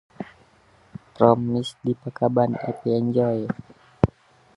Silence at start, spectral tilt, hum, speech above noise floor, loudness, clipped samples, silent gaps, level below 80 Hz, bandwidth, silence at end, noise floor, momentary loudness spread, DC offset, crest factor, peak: 0.2 s; -8.5 dB/octave; none; 35 dB; -23 LUFS; under 0.1%; none; -48 dBFS; 11.5 kHz; 0.5 s; -57 dBFS; 18 LU; under 0.1%; 24 dB; 0 dBFS